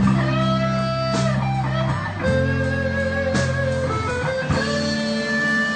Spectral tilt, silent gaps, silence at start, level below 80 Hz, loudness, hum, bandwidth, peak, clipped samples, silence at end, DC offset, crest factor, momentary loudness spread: -6 dB/octave; none; 0 s; -38 dBFS; -21 LUFS; none; 9.2 kHz; -6 dBFS; under 0.1%; 0 s; under 0.1%; 14 dB; 3 LU